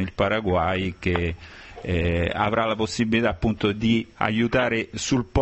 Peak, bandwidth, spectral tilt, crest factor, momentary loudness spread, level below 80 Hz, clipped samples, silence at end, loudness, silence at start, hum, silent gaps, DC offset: -4 dBFS; 8.4 kHz; -5.5 dB/octave; 20 dB; 5 LU; -36 dBFS; under 0.1%; 0 s; -23 LUFS; 0 s; none; none; under 0.1%